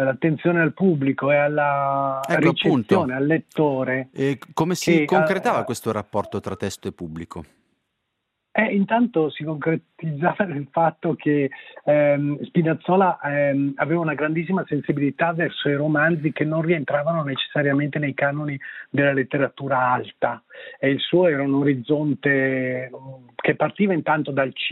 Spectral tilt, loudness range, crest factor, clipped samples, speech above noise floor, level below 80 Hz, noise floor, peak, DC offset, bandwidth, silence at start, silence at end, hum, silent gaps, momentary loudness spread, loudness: -6.5 dB/octave; 4 LU; 18 dB; under 0.1%; 56 dB; -64 dBFS; -77 dBFS; -2 dBFS; under 0.1%; 14.5 kHz; 0 s; 0 s; none; none; 9 LU; -22 LUFS